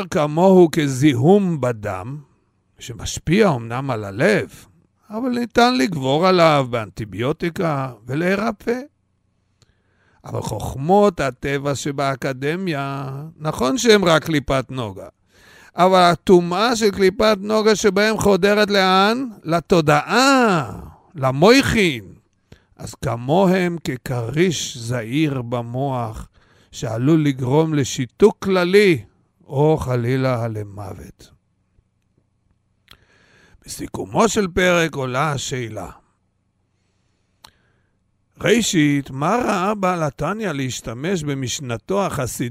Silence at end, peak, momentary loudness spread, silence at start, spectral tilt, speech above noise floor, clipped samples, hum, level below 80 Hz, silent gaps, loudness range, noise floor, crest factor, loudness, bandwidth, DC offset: 0 s; 0 dBFS; 16 LU; 0 s; -5.5 dB/octave; 49 dB; under 0.1%; none; -46 dBFS; none; 8 LU; -67 dBFS; 20 dB; -18 LUFS; 16 kHz; under 0.1%